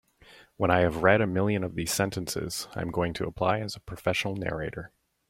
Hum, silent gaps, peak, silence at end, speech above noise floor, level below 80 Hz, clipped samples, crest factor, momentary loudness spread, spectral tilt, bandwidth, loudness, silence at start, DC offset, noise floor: none; none; -6 dBFS; 0.4 s; 28 dB; -52 dBFS; under 0.1%; 22 dB; 11 LU; -5 dB/octave; 16.5 kHz; -28 LUFS; 0.3 s; under 0.1%; -55 dBFS